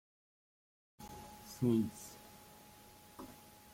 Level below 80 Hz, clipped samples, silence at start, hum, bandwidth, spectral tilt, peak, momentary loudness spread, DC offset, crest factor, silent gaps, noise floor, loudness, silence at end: -70 dBFS; under 0.1%; 1 s; none; 16.5 kHz; -6.5 dB/octave; -22 dBFS; 23 LU; under 0.1%; 22 dB; none; -59 dBFS; -38 LUFS; 0.4 s